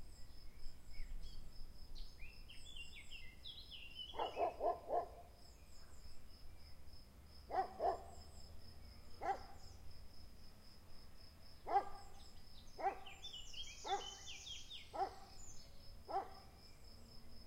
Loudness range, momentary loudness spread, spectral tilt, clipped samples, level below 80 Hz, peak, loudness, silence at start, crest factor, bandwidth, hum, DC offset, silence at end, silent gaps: 7 LU; 20 LU; -3.5 dB/octave; under 0.1%; -58 dBFS; -26 dBFS; -47 LUFS; 0 s; 22 dB; 16 kHz; none; under 0.1%; 0 s; none